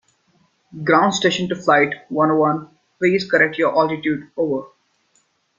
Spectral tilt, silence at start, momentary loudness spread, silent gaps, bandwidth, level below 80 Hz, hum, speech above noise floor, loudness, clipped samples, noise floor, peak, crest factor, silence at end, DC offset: -5 dB/octave; 0.75 s; 7 LU; none; 7.6 kHz; -62 dBFS; none; 45 dB; -18 LUFS; under 0.1%; -63 dBFS; -2 dBFS; 18 dB; 0.9 s; under 0.1%